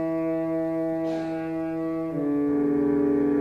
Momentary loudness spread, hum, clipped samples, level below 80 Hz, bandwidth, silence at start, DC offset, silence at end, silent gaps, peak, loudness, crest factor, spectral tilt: 7 LU; none; under 0.1%; -56 dBFS; 5.6 kHz; 0 s; under 0.1%; 0 s; none; -14 dBFS; -26 LUFS; 12 dB; -9 dB/octave